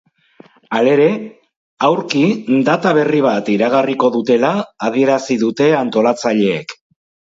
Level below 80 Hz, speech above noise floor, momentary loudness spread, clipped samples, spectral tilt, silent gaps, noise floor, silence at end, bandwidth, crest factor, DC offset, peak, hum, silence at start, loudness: -64 dBFS; 32 dB; 6 LU; under 0.1%; -6 dB/octave; 1.56-1.77 s; -46 dBFS; 0.65 s; 7.8 kHz; 14 dB; under 0.1%; 0 dBFS; none; 0.7 s; -15 LUFS